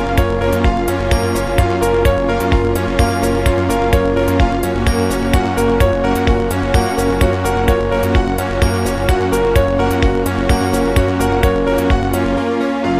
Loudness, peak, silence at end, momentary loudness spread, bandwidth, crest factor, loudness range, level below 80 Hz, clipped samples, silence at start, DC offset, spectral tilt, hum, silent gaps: -15 LUFS; 0 dBFS; 0 s; 2 LU; 15.5 kHz; 14 dB; 0 LU; -20 dBFS; under 0.1%; 0 s; 0.8%; -6 dB/octave; none; none